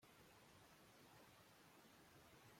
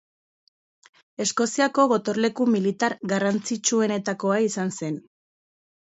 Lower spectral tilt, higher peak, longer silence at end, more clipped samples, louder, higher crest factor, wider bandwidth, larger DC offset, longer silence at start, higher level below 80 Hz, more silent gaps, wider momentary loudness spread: about the same, -3.5 dB/octave vs -4 dB/octave; second, -54 dBFS vs -6 dBFS; second, 0 s vs 0.95 s; neither; second, -68 LUFS vs -23 LUFS; second, 14 dB vs 20 dB; first, 16.5 kHz vs 8.2 kHz; neither; second, 0 s vs 1.2 s; second, -86 dBFS vs -72 dBFS; neither; second, 1 LU vs 8 LU